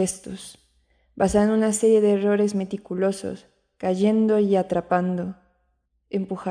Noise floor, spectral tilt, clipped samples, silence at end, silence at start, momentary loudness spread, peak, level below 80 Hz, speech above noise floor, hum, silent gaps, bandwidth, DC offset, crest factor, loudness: -70 dBFS; -6 dB/octave; under 0.1%; 0 s; 0 s; 16 LU; -6 dBFS; -52 dBFS; 48 dB; none; none; 10.5 kHz; under 0.1%; 16 dB; -22 LUFS